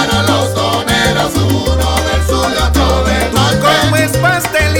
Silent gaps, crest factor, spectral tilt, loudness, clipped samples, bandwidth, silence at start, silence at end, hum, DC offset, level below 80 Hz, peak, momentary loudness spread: none; 12 dB; -4.5 dB/octave; -12 LUFS; under 0.1%; 19.5 kHz; 0 s; 0 s; none; 0.4%; -20 dBFS; 0 dBFS; 3 LU